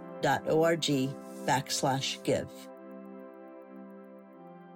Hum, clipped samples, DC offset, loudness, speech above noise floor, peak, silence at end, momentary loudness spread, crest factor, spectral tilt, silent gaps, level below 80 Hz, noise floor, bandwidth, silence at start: none; under 0.1%; under 0.1%; -30 LUFS; 21 dB; -16 dBFS; 0 s; 23 LU; 16 dB; -4 dB/octave; none; -70 dBFS; -50 dBFS; 16.5 kHz; 0 s